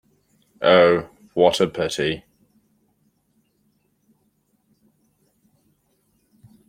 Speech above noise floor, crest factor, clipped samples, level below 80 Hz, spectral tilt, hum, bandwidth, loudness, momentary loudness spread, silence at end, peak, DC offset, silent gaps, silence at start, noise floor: 49 dB; 22 dB; under 0.1%; -60 dBFS; -4.5 dB/octave; 50 Hz at -65 dBFS; 15 kHz; -19 LUFS; 12 LU; 4.5 s; -2 dBFS; under 0.1%; none; 0.6 s; -67 dBFS